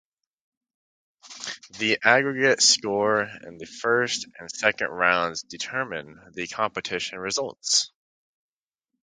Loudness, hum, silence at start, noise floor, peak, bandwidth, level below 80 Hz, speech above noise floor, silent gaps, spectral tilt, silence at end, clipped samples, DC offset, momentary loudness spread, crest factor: -23 LUFS; none; 1.25 s; -85 dBFS; 0 dBFS; 9.6 kHz; -66 dBFS; 60 dB; none; -1.5 dB/octave; 1.15 s; under 0.1%; under 0.1%; 17 LU; 26 dB